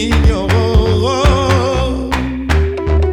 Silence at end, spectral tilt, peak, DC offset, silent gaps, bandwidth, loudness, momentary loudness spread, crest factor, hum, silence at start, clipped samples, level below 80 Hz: 0 s; -6.5 dB/octave; -2 dBFS; under 0.1%; none; 12.5 kHz; -14 LUFS; 5 LU; 10 dB; none; 0 s; under 0.1%; -18 dBFS